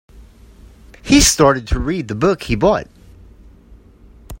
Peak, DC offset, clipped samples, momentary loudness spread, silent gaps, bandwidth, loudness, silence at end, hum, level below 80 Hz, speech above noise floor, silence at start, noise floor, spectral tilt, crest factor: 0 dBFS; under 0.1%; under 0.1%; 11 LU; none; 16.5 kHz; -15 LUFS; 0.05 s; none; -30 dBFS; 30 dB; 0.15 s; -44 dBFS; -4 dB/octave; 18 dB